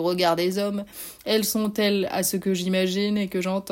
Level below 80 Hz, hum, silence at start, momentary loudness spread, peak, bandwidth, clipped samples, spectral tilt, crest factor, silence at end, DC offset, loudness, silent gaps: -60 dBFS; none; 0 s; 6 LU; -8 dBFS; 16.5 kHz; under 0.1%; -4.5 dB/octave; 16 dB; 0 s; under 0.1%; -24 LUFS; none